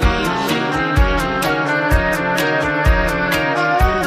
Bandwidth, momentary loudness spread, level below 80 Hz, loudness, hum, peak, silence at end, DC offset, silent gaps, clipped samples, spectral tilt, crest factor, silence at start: 15.5 kHz; 2 LU; -22 dBFS; -17 LUFS; none; -2 dBFS; 0 s; under 0.1%; none; under 0.1%; -5 dB/octave; 14 dB; 0 s